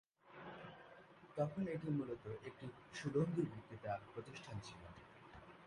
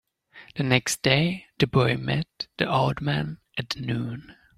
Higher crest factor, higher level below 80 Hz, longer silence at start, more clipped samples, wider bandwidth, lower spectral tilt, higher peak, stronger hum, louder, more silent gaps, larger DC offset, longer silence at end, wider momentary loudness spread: about the same, 20 dB vs 20 dB; second, -72 dBFS vs -54 dBFS; about the same, 0.25 s vs 0.35 s; neither; second, 11.5 kHz vs 15.5 kHz; first, -7 dB/octave vs -5 dB/octave; second, -26 dBFS vs -6 dBFS; neither; second, -45 LUFS vs -25 LUFS; neither; neither; second, 0 s vs 0.25 s; first, 19 LU vs 13 LU